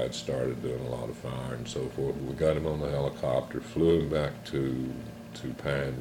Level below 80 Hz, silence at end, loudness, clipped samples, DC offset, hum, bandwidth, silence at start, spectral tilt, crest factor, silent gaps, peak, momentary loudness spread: -48 dBFS; 0 s; -31 LUFS; under 0.1%; under 0.1%; none; 17 kHz; 0 s; -6.5 dB/octave; 16 dB; none; -14 dBFS; 10 LU